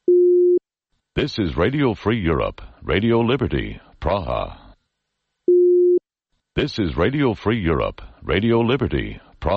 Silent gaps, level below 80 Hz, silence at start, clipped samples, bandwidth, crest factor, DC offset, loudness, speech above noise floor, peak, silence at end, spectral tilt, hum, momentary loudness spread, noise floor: none; -36 dBFS; 0.1 s; under 0.1%; 6.4 kHz; 12 dB; under 0.1%; -20 LUFS; 56 dB; -8 dBFS; 0 s; -8 dB/octave; none; 13 LU; -77 dBFS